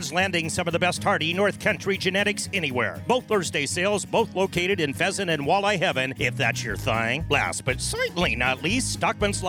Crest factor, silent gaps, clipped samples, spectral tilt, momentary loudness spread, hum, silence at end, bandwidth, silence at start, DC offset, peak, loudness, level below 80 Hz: 18 dB; none; under 0.1%; -3.5 dB/octave; 3 LU; none; 0 s; over 20 kHz; 0 s; under 0.1%; -6 dBFS; -24 LUFS; -44 dBFS